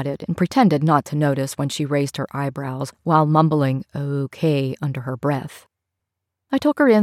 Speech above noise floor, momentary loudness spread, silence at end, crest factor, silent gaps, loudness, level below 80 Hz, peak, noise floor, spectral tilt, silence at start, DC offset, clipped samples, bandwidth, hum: 62 dB; 10 LU; 0 s; 18 dB; none; -21 LUFS; -62 dBFS; -4 dBFS; -81 dBFS; -7 dB/octave; 0 s; under 0.1%; under 0.1%; 14.5 kHz; none